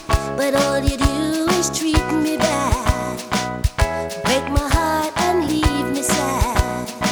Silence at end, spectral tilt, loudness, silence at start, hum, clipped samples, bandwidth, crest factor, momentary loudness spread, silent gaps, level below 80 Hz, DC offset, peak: 0 s; -4.5 dB/octave; -19 LUFS; 0 s; none; under 0.1%; over 20 kHz; 16 dB; 4 LU; none; -26 dBFS; under 0.1%; -2 dBFS